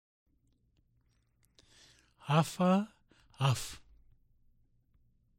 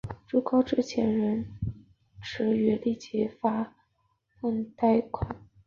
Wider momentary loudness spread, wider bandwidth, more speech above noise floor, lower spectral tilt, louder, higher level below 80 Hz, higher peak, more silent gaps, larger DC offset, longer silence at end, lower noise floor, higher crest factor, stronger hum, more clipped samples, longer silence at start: first, 18 LU vs 12 LU; first, 16 kHz vs 7.2 kHz; about the same, 43 dB vs 46 dB; second, -6 dB/octave vs -7.5 dB/octave; about the same, -31 LUFS vs -29 LUFS; second, -64 dBFS vs -52 dBFS; about the same, -14 dBFS vs -12 dBFS; neither; neither; first, 1.6 s vs 0.3 s; about the same, -73 dBFS vs -73 dBFS; about the same, 22 dB vs 18 dB; neither; neither; first, 2.25 s vs 0.05 s